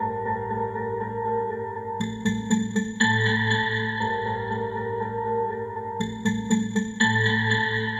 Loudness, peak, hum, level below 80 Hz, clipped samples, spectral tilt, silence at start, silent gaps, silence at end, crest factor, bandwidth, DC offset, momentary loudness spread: -25 LUFS; -8 dBFS; none; -54 dBFS; under 0.1%; -5 dB/octave; 0 s; none; 0 s; 18 dB; 12.5 kHz; under 0.1%; 9 LU